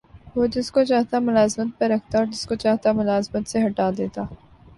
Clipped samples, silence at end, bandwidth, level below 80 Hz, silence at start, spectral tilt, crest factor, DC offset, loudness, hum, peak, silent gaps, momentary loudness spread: under 0.1%; 0.4 s; 11.5 kHz; -50 dBFS; 0.15 s; -5.5 dB/octave; 14 dB; under 0.1%; -22 LUFS; none; -6 dBFS; none; 8 LU